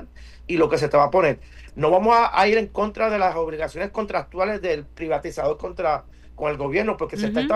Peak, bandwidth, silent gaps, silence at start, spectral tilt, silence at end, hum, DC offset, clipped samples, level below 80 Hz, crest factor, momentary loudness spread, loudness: -6 dBFS; 12.5 kHz; none; 0 s; -6 dB/octave; 0 s; none; under 0.1%; under 0.1%; -44 dBFS; 16 dB; 11 LU; -22 LUFS